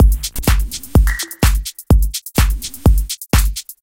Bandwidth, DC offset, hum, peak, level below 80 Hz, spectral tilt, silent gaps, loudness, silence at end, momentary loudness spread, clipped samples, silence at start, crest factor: 17.5 kHz; under 0.1%; none; 0 dBFS; -16 dBFS; -4.5 dB/octave; none; -17 LUFS; 0.1 s; 4 LU; under 0.1%; 0 s; 14 dB